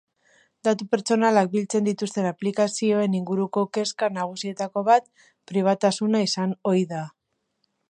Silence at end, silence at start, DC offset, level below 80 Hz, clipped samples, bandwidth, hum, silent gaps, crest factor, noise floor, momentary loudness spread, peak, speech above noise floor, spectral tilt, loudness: 0.8 s; 0.65 s; under 0.1%; -76 dBFS; under 0.1%; 10.5 kHz; none; none; 18 dB; -74 dBFS; 8 LU; -6 dBFS; 51 dB; -5 dB/octave; -24 LUFS